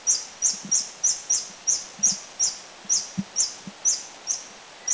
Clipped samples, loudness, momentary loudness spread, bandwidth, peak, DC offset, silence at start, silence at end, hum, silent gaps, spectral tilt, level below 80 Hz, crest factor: under 0.1%; -23 LUFS; 8 LU; 8 kHz; -8 dBFS; under 0.1%; 0 s; 0 s; none; none; 0.5 dB/octave; -66 dBFS; 18 dB